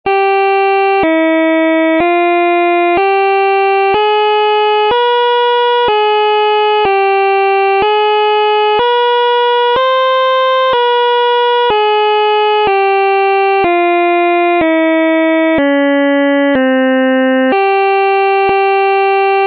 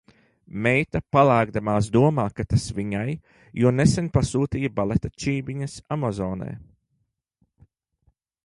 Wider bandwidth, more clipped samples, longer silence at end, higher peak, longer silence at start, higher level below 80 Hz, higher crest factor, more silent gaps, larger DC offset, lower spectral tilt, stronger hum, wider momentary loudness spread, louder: second, 5.6 kHz vs 11.5 kHz; neither; second, 0 s vs 1.8 s; about the same, -4 dBFS vs -4 dBFS; second, 0.05 s vs 0.55 s; second, -50 dBFS vs -44 dBFS; second, 6 dB vs 20 dB; neither; neither; about the same, -6 dB/octave vs -6.5 dB/octave; neither; second, 0 LU vs 13 LU; first, -10 LUFS vs -23 LUFS